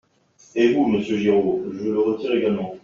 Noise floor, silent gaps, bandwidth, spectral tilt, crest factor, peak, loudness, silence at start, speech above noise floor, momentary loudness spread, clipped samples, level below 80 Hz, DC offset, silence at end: -55 dBFS; none; 7.2 kHz; -5.5 dB/octave; 16 dB; -6 dBFS; -21 LUFS; 0.55 s; 35 dB; 6 LU; under 0.1%; -60 dBFS; under 0.1%; 0.05 s